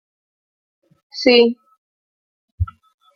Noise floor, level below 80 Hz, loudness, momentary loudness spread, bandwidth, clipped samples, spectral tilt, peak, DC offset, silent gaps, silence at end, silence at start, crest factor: under -90 dBFS; -42 dBFS; -17 LUFS; 21 LU; 7 kHz; under 0.1%; -6 dB/octave; -2 dBFS; under 0.1%; 1.78-2.58 s; 0.5 s; 1.15 s; 20 dB